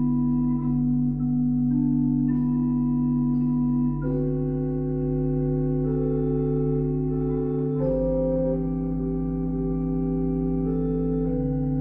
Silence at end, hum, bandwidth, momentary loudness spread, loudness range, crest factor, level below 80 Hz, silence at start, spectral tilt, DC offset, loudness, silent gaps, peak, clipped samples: 0 s; 50 Hz at -55 dBFS; 2.3 kHz; 4 LU; 2 LU; 10 dB; -36 dBFS; 0 s; -14 dB/octave; under 0.1%; -25 LUFS; none; -14 dBFS; under 0.1%